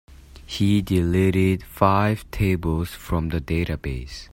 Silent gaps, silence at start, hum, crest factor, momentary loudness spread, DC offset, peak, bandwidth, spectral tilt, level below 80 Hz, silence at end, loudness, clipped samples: none; 0.1 s; none; 22 dB; 9 LU; under 0.1%; 0 dBFS; 16.5 kHz; -7 dB/octave; -38 dBFS; 0.1 s; -22 LUFS; under 0.1%